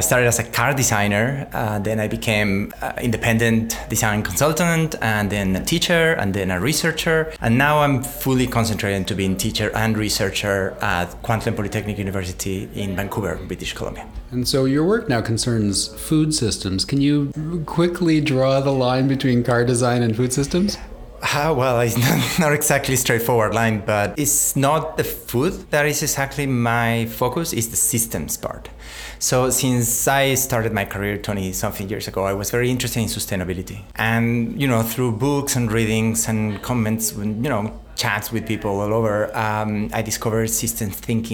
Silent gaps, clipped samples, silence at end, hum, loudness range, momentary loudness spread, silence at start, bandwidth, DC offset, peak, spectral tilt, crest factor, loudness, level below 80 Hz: none; under 0.1%; 0 s; none; 4 LU; 8 LU; 0 s; 19 kHz; under 0.1%; -2 dBFS; -4.5 dB/octave; 18 dB; -20 LUFS; -40 dBFS